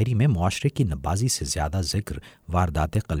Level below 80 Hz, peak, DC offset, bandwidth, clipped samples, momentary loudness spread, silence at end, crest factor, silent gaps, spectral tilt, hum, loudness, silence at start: -36 dBFS; -10 dBFS; under 0.1%; 16.5 kHz; under 0.1%; 7 LU; 0 s; 14 dB; none; -5 dB/octave; none; -25 LUFS; 0 s